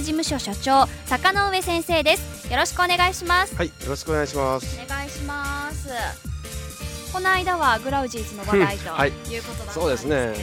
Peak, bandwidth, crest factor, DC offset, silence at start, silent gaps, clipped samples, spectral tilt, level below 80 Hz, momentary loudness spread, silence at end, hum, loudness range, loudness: -4 dBFS; 19 kHz; 20 dB; under 0.1%; 0 s; none; under 0.1%; -3.5 dB/octave; -36 dBFS; 12 LU; 0 s; none; 7 LU; -23 LUFS